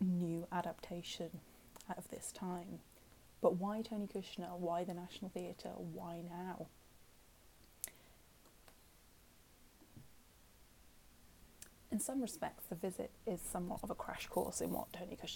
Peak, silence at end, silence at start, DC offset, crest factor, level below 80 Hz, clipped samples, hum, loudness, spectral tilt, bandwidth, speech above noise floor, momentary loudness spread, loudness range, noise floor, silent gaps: -18 dBFS; 0 s; 0 s; under 0.1%; 28 dB; -66 dBFS; under 0.1%; none; -44 LUFS; -5 dB/octave; 17.5 kHz; 22 dB; 24 LU; 15 LU; -66 dBFS; none